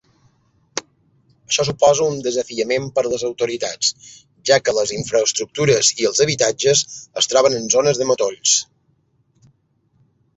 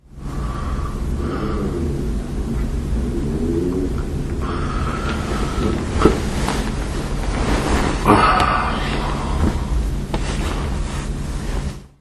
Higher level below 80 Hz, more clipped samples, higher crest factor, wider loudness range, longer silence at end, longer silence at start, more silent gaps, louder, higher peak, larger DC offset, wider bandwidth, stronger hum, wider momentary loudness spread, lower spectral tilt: second, -56 dBFS vs -24 dBFS; neither; about the same, 18 dB vs 20 dB; about the same, 4 LU vs 5 LU; first, 1.75 s vs 0.1 s; first, 0.75 s vs 0.1 s; neither; first, -17 LUFS vs -21 LUFS; about the same, -2 dBFS vs 0 dBFS; neither; second, 8.4 kHz vs 12.5 kHz; neither; about the same, 9 LU vs 9 LU; second, -2.5 dB/octave vs -6 dB/octave